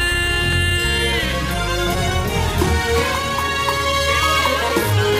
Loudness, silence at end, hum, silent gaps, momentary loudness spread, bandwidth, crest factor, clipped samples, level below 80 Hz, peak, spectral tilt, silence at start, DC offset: -18 LUFS; 0 s; none; none; 4 LU; 16 kHz; 14 dB; under 0.1%; -28 dBFS; -6 dBFS; -4 dB/octave; 0 s; under 0.1%